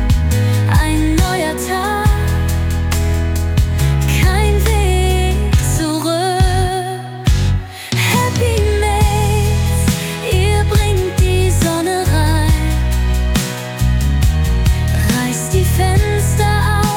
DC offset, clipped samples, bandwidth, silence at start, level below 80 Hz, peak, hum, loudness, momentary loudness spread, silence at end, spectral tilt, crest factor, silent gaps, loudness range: under 0.1%; under 0.1%; 17.5 kHz; 0 s; -18 dBFS; -2 dBFS; none; -15 LUFS; 4 LU; 0 s; -5.5 dB/octave; 12 dB; none; 1 LU